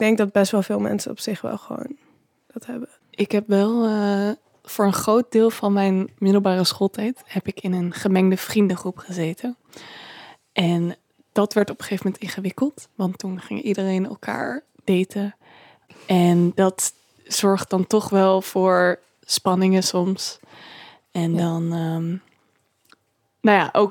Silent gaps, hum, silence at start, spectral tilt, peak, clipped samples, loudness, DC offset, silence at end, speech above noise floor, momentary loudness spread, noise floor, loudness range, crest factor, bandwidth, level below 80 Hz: none; none; 0 s; -5.5 dB/octave; -2 dBFS; under 0.1%; -21 LUFS; under 0.1%; 0 s; 48 dB; 15 LU; -69 dBFS; 6 LU; 20 dB; 18.5 kHz; -68 dBFS